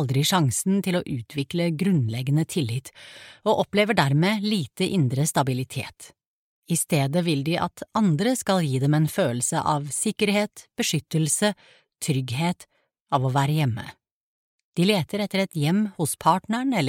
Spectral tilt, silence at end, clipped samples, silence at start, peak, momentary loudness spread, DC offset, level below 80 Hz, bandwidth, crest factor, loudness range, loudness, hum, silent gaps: -5 dB/octave; 0 s; under 0.1%; 0 s; -4 dBFS; 9 LU; under 0.1%; -60 dBFS; 17 kHz; 20 dB; 3 LU; -24 LUFS; none; 6.26-6.62 s, 13.00-13.06 s, 14.11-14.72 s